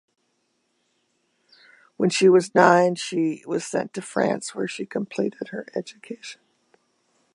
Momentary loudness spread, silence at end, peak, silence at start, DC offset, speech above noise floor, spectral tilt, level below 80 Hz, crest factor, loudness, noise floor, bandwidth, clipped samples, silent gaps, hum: 19 LU; 1 s; 0 dBFS; 2 s; under 0.1%; 49 dB; -5 dB/octave; -74 dBFS; 24 dB; -22 LUFS; -71 dBFS; 11.5 kHz; under 0.1%; none; none